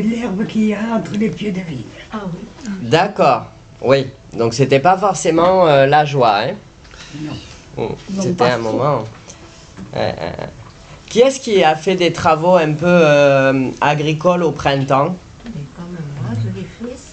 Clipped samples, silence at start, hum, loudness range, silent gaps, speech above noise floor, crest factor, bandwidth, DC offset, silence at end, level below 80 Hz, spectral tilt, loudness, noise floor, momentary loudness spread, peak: under 0.1%; 0 s; none; 7 LU; none; 23 dB; 14 dB; 9 kHz; under 0.1%; 0 s; -46 dBFS; -5.5 dB/octave; -15 LUFS; -38 dBFS; 18 LU; 0 dBFS